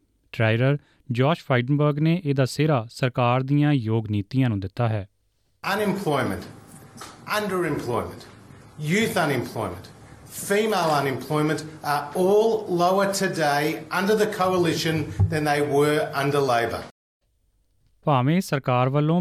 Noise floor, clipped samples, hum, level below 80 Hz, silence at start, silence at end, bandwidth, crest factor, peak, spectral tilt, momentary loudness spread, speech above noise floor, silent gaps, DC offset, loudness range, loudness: -67 dBFS; under 0.1%; none; -56 dBFS; 0.35 s; 0 s; 15 kHz; 14 dB; -8 dBFS; -6 dB/octave; 10 LU; 45 dB; 16.91-17.20 s; under 0.1%; 5 LU; -23 LUFS